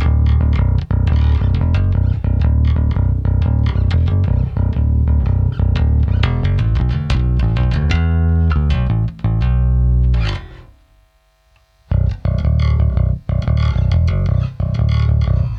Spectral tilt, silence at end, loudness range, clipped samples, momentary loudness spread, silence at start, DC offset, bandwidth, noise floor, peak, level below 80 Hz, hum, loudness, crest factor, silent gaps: -8.5 dB/octave; 0 s; 4 LU; under 0.1%; 4 LU; 0 s; under 0.1%; 6.2 kHz; -55 dBFS; -4 dBFS; -18 dBFS; none; -16 LUFS; 12 dB; none